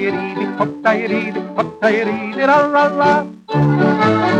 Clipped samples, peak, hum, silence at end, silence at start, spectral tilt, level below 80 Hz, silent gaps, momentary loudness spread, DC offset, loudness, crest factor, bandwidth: under 0.1%; -2 dBFS; none; 0 s; 0 s; -7.5 dB/octave; -54 dBFS; none; 8 LU; under 0.1%; -16 LUFS; 14 dB; 9.4 kHz